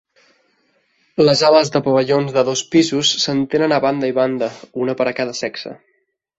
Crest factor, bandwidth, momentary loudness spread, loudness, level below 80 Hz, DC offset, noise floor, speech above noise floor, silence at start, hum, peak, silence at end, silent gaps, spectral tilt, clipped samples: 16 dB; 8 kHz; 12 LU; -16 LUFS; -60 dBFS; under 0.1%; -62 dBFS; 46 dB; 1.2 s; none; 0 dBFS; 0.65 s; none; -4.5 dB/octave; under 0.1%